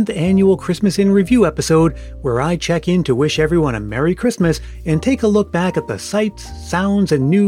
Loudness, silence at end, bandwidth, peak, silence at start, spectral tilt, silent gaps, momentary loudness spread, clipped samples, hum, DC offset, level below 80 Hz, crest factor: -16 LUFS; 0 s; 15 kHz; -2 dBFS; 0 s; -6.5 dB/octave; none; 7 LU; under 0.1%; none; under 0.1%; -34 dBFS; 14 dB